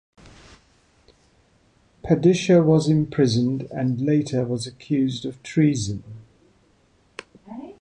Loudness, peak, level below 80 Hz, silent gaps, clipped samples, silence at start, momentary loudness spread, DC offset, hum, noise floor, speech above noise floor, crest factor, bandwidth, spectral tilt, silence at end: -21 LUFS; -6 dBFS; -54 dBFS; none; under 0.1%; 2.05 s; 23 LU; under 0.1%; none; -60 dBFS; 40 dB; 18 dB; 10 kHz; -7 dB/octave; 0.1 s